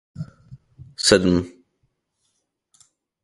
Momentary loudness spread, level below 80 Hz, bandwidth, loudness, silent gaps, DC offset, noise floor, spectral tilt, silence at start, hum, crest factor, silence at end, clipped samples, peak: 22 LU; -46 dBFS; 11.5 kHz; -18 LUFS; none; under 0.1%; -73 dBFS; -4 dB/octave; 0.2 s; none; 24 dB; 1.75 s; under 0.1%; 0 dBFS